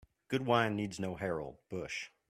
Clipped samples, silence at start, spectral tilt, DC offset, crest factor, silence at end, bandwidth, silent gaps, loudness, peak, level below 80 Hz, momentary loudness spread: under 0.1%; 0.3 s; -5.5 dB/octave; under 0.1%; 22 dB; 0.2 s; 15 kHz; none; -36 LUFS; -14 dBFS; -66 dBFS; 11 LU